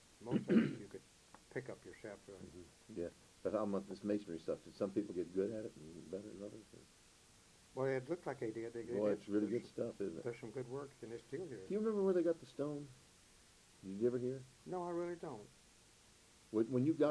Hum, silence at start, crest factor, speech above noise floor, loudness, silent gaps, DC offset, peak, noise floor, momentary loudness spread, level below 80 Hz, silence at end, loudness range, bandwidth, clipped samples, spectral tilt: none; 0.2 s; 22 dB; 26 dB; -42 LUFS; none; under 0.1%; -20 dBFS; -66 dBFS; 18 LU; -74 dBFS; 0 s; 5 LU; 11 kHz; under 0.1%; -7 dB/octave